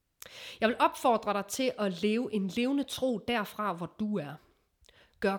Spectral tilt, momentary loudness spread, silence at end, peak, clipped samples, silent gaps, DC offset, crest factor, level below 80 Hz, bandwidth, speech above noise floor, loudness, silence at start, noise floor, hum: -4.5 dB/octave; 14 LU; 0 s; -14 dBFS; under 0.1%; none; under 0.1%; 18 dB; -66 dBFS; 20 kHz; 35 dB; -31 LUFS; 0.25 s; -65 dBFS; none